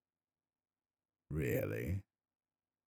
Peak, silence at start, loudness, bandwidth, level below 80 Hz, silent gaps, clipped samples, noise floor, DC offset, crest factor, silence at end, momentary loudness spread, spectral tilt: -24 dBFS; 1.3 s; -40 LUFS; 19.5 kHz; -58 dBFS; none; under 0.1%; under -90 dBFS; under 0.1%; 20 dB; 0.85 s; 8 LU; -7.5 dB/octave